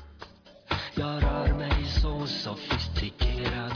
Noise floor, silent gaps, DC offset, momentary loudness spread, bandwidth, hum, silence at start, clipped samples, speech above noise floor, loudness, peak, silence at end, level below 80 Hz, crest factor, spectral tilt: -49 dBFS; none; under 0.1%; 6 LU; 5.4 kHz; none; 0 s; under 0.1%; 21 dB; -29 LUFS; -14 dBFS; 0 s; -32 dBFS; 16 dB; -6 dB/octave